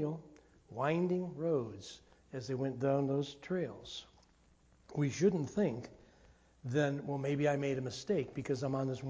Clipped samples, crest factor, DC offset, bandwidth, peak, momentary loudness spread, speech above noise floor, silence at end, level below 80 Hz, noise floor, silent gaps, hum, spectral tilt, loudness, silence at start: under 0.1%; 18 dB; under 0.1%; 8 kHz; -18 dBFS; 15 LU; 32 dB; 0 s; -68 dBFS; -67 dBFS; none; none; -6.5 dB/octave; -36 LUFS; 0 s